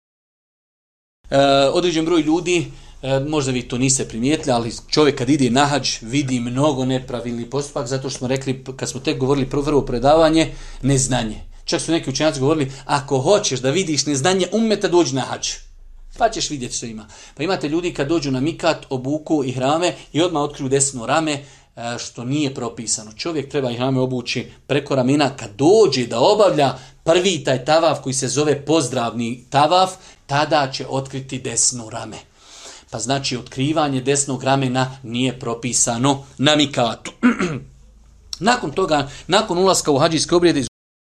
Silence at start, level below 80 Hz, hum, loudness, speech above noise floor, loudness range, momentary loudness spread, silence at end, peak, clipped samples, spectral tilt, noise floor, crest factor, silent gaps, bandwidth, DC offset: 1.3 s; -44 dBFS; none; -19 LUFS; 28 dB; 5 LU; 10 LU; 0.35 s; 0 dBFS; under 0.1%; -4 dB/octave; -47 dBFS; 18 dB; none; 13.5 kHz; under 0.1%